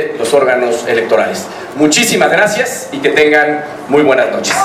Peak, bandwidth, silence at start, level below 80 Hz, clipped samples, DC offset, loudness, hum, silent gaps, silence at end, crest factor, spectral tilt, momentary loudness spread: 0 dBFS; 16 kHz; 0 s; -54 dBFS; 0.2%; under 0.1%; -11 LUFS; none; none; 0 s; 12 dB; -3 dB/octave; 8 LU